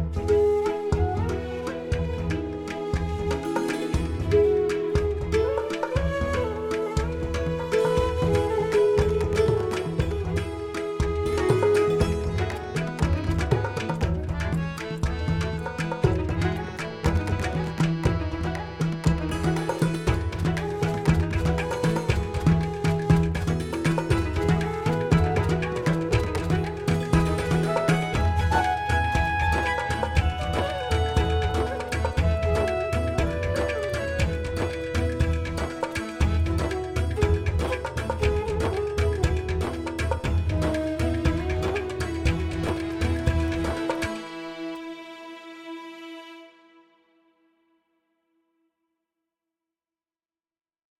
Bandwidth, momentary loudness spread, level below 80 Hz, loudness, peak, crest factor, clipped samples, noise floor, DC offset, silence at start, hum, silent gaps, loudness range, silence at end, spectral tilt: 14.5 kHz; 7 LU; -34 dBFS; -26 LUFS; -6 dBFS; 18 dB; under 0.1%; under -90 dBFS; under 0.1%; 0 s; none; none; 4 LU; 4.5 s; -6.5 dB/octave